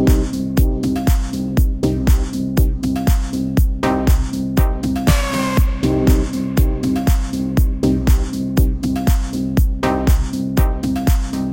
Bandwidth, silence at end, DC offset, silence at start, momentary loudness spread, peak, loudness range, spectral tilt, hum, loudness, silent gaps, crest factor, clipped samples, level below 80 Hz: 17 kHz; 0 s; under 0.1%; 0 s; 3 LU; -2 dBFS; 1 LU; -6.5 dB/octave; none; -18 LUFS; none; 14 dB; under 0.1%; -18 dBFS